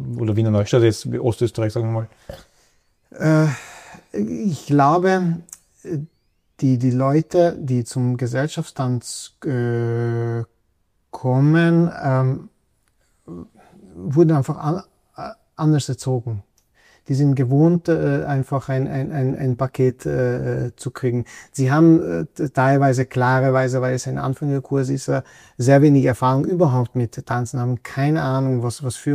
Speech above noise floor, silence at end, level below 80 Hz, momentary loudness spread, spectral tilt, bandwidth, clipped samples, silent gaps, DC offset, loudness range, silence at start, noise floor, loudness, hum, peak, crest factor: 48 dB; 0 s; -54 dBFS; 14 LU; -7.5 dB/octave; 13 kHz; under 0.1%; none; under 0.1%; 5 LU; 0 s; -67 dBFS; -20 LUFS; none; -2 dBFS; 16 dB